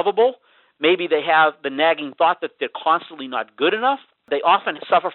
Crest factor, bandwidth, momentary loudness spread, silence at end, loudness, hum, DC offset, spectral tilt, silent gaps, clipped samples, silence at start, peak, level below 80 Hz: 18 dB; 4.3 kHz; 10 LU; 0 s; -20 LUFS; none; under 0.1%; -0.5 dB/octave; none; under 0.1%; 0 s; -2 dBFS; -68 dBFS